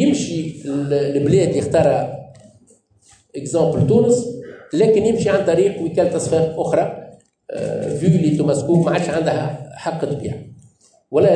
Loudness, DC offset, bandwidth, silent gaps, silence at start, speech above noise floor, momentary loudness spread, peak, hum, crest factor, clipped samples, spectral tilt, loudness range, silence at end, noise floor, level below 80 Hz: -18 LUFS; under 0.1%; 10 kHz; none; 0 s; 37 dB; 13 LU; -4 dBFS; none; 14 dB; under 0.1%; -6.5 dB/octave; 3 LU; 0 s; -54 dBFS; -52 dBFS